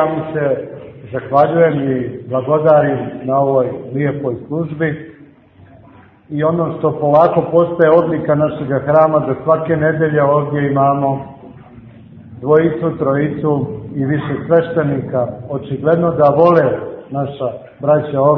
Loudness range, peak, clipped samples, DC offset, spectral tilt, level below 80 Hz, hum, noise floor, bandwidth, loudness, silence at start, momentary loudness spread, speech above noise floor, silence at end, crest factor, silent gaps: 5 LU; 0 dBFS; under 0.1%; under 0.1%; -11 dB/octave; -50 dBFS; none; -44 dBFS; 4.7 kHz; -15 LUFS; 0 s; 11 LU; 29 dB; 0 s; 14 dB; none